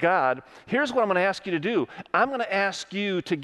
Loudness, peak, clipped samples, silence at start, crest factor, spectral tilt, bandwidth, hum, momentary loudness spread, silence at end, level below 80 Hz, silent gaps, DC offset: -25 LUFS; -8 dBFS; under 0.1%; 0 s; 18 dB; -5 dB/octave; 12 kHz; none; 6 LU; 0 s; -68 dBFS; none; under 0.1%